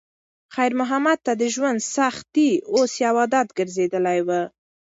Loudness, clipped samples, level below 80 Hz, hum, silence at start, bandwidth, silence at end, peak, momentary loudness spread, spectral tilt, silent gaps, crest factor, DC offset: -21 LUFS; under 0.1%; -70 dBFS; none; 0.5 s; 8 kHz; 0.5 s; -6 dBFS; 5 LU; -4 dB/octave; none; 16 dB; under 0.1%